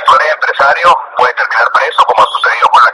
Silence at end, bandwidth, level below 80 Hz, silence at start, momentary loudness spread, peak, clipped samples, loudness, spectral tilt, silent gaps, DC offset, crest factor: 0 s; 11.5 kHz; -50 dBFS; 0 s; 4 LU; 0 dBFS; 0.8%; -9 LUFS; -1 dB/octave; none; under 0.1%; 8 dB